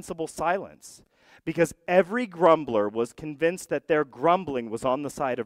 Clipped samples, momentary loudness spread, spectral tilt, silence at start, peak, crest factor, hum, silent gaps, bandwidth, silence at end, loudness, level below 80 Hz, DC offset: under 0.1%; 10 LU; -5.5 dB/octave; 0.05 s; -6 dBFS; 20 dB; none; none; 15.5 kHz; 0 s; -26 LUFS; -60 dBFS; under 0.1%